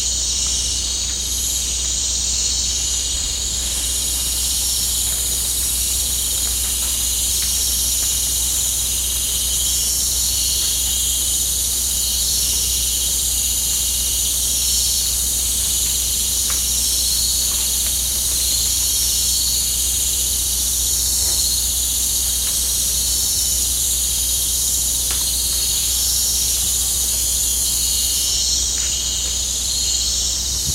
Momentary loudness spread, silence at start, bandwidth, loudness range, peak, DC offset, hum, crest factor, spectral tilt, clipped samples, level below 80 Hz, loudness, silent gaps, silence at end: 3 LU; 0 s; 16 kHz; 2 LU; -4 dBFS; under 0.1%; none; 14 dB; 0 dB/octave; under 0.1%; -30 dBFS; -16 LUFS; none; 0 s